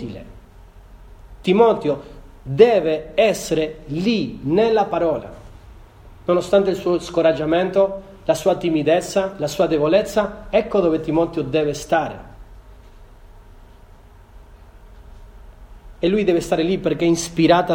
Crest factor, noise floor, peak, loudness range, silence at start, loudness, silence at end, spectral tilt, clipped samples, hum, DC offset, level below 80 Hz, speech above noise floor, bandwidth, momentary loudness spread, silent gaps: 20 dB; -45 dBFS; 0 dBFS; 7 LU; 0 s; -19 LUFS; 0 s; -5.5 dB/octave; under 0.1%; none; under 0.1%; -44 dBFS; 27 dB; 17 kHz; 10 LU; none